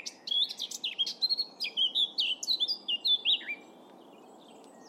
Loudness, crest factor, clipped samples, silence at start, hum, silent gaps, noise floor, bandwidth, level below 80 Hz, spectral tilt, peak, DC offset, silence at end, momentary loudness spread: -28 LUFS; 16 dB; under 0.1%; 0 s; none; none; -53 dBFS; 16.5 kHz; under -90 dBFS; 1.5 dB/octave; -16 dBFS; under 0.1%; 0 s; 8 LU